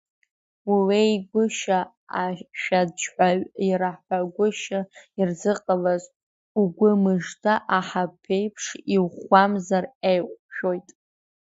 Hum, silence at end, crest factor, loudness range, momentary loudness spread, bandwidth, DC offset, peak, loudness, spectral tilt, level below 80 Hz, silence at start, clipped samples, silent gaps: none; 0.6 s; 22 dB; 2 LU; 10 LU; 8 kHz; under 0.1%; -2 dBFS; -24 LUFS; -5.5 dB/octave; -68 dBFS; 0.65 s; under 0.1%; 1.97-2.07 s, 6.16-6.55 s, 9.95-10.01 s, 10.39-10.49 s